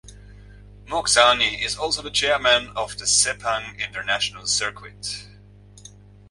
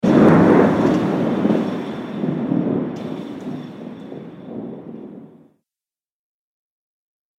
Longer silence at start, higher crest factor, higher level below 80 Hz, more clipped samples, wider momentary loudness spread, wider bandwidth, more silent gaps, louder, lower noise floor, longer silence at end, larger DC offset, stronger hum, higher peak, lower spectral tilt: about the same, 0.05 s vs 0.05 s; about the same, 22 dB vs 18 dB; about the same, -48 dBFS vs -52 dBFS; neither; second, 14 LU vs 23 LU; about the same, 11.5 kHz vs 10.5 kHz; neither; about the same, -20 LUFS vs -18 LUFS; second, -47 dBFS vs under -90 dBFS; second, 0.4 s vs 2.1 s; neither; first, 50 Hz at -45 dBFS vs none; about the same, -2 dBFS vs -2 dBFS; second, 0 dB/octave vs -8.5 dB/octave